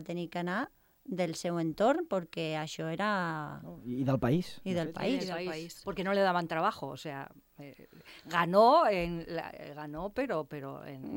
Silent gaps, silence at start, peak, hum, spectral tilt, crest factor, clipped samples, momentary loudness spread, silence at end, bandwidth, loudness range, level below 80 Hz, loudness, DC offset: none; 0 s; -12 dBFS; none; -6 dB/octave; 20 dB; under 0.1%; 16 LU; 0 s; 17 kHz; 4 LU; -60 dBFS; -32 LUFS; under 0.1%